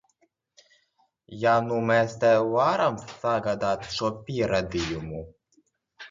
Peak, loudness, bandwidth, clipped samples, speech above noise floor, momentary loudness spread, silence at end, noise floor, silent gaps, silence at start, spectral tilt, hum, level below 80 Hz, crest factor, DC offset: -8 dBFS; -25 LUFS; 7.6 kHz; under 0.1%; 45 dB; 12 LU; 0.05 s; -70 dBFS; none; 1.3 s; -5.5 dB/octave; none; -52 dBFS; 18 dB; under 0.1%